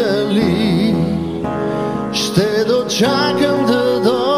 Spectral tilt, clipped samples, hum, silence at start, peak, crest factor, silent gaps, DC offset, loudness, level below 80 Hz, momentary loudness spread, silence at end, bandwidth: -5.5 dB/octave; under 0.1%; none; 0 s; 0 dBFS; 14 dB; none; 0.3%; -16 LUFS; -46 dBFS; 5 LU; 0 s; 16 kHz